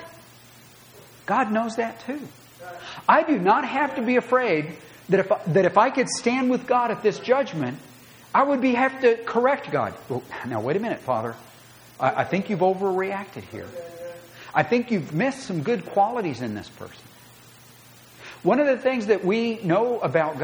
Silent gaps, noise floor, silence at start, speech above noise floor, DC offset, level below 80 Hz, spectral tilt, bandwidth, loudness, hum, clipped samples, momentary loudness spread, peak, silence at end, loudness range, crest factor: none; -49 dBFS; 0 s; 26 dB; under 0.1%; -66 dBFS; -5.5 dB/octave; over 20 kHz; -23 LUFS; none; under 0.1%; 18 LU; -4 dBFS; 0 s; 5 LU; 20 dB